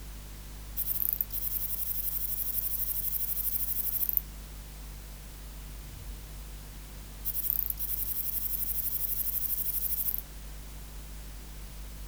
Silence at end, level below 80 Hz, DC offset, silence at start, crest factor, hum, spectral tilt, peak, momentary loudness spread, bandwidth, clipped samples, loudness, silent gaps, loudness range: 0 s; -44 dBFS; under 0.1%; 0 s; 28 dB; 50 Hz at -45 dBFS; -2.5 dB/octave; -6 dBFS; 17 LU; over 20 kHz; under 0.1%; -29 LUFS; none; 7 LU